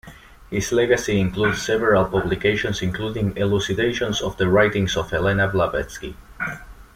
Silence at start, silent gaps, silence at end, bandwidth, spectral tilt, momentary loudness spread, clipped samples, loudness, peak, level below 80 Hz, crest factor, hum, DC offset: 0.05 s; none; 0.1 s; 16 kHz; -5 dB/octave; 11 LU; under 0.1%; -21 LUFS; -4 dBFS; -40 dBFS; 18 dB; none; under 0.1%